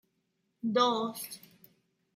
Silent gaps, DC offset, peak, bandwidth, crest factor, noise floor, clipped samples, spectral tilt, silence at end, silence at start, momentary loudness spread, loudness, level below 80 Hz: none; under 0.1%; -14 dBFS; 16.5 kHz; 22 dB; -79 dBFS; under 0.1%; -4 dB/octave; 0.8 s; 0.65 s; 16 LU; -31 LUFS; -82 dBFS